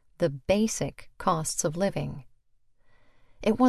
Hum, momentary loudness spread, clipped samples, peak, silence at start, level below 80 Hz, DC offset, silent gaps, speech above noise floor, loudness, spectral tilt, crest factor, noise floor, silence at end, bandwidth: none; 10 LU; under 0.1%; -8 dBFS; 0.2 s; -52 dBFS; under 0.1%; none; 36 dB; -29 LUFS; -5 dB/octave; 20 dB; -62 dBFS; 0 s; 14 kHz